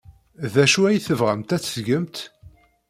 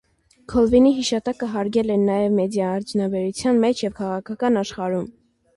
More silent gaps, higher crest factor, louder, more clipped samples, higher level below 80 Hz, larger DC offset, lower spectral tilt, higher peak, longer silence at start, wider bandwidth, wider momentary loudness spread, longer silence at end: neither; about the same, 18 dB vs 16 dB; about the same, -20 LUFS vs -21 LUFS; neither; second, -58 dBFS vs -48 dBFS; neither; second, -4.5 dB/octave vs -6 dB/octave; about the same, -4 dBFS vs -6 dBFS; second, 0.1 s vs 0.5 s; first, 16 kHz vs 11.5 kHz; first, 16 LU vs 9 LU; about the same, 0.4 s vs 0.45 s